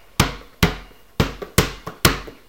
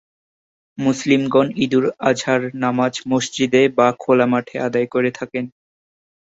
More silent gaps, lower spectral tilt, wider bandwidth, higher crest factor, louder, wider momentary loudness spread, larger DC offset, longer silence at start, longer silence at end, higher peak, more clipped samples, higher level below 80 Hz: neither; about the same, -4 dB/octave vs -5 dB/octave; first, 17 kHz vs 8 kHz; about the same, 22 dB vs 18 dB; second, -21 LUFS vs -18 LUFS; about the same, 8 LU vs 7 LU; first, 0.3% vs under 0.1%; second, 0.2 s vs 0.8 s; second, 0.15 s vs 0.8 s; about the same, 0 dBFS vs -2 dBFS; neither; first, -32 dBFS vs -60 dBFS